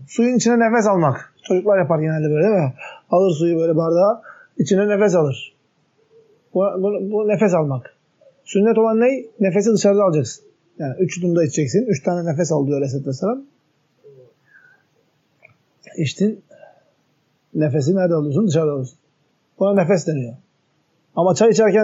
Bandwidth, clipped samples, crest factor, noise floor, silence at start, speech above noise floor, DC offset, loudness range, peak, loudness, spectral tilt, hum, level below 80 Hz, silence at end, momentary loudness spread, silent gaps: 8 kHz; under 0.1%; 16 dB; -64 dBFS; 0 s; 47 dB; under 0.1%; 10 LU; -4 dBFS; -18 LUFS; -6.5 dB/octave; none; -70 dBFS; 0 s; 13 LU; none